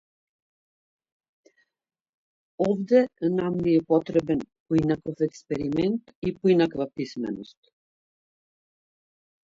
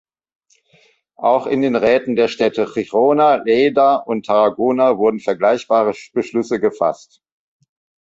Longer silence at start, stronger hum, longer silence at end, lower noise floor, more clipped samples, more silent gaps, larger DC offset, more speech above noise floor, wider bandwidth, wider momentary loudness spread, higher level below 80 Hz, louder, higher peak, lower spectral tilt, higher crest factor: first, 2.6 s vs 1.2 s; neither; first, 2.1 s vs 1.05 s; first, under -90 dBFS vs -56 dBFS; neither; first, 4.60-4.66 s, 6.15-6.22 s vs none; neither; first, over 66 dB vs 40 dB; about the same, 7.6 kHz vs 7.8 kHz; first, 10 LU vs 7 LU; about the same, -58 dBFS vs -60 dBFS; second, -25 LUFS vs -16 LUFS; second, -8 dBFS vs -2 dBFS; first, -8 dB/octave vs -6 dB/octave; first, 20 dB vs 14 dB